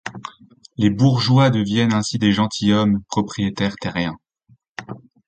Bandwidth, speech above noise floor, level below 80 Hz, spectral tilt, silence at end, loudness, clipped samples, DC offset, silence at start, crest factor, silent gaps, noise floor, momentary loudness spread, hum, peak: 9 kHz; 39 dB; -48 dBFS; -6 dB/octave; 0.3 s; -19 LUFS; under 0.1%; under 0.1%; 0.05 s; 16 dB; 4.69-4.75 s; -57 dBFS; 21 LU; none; -4 dBFS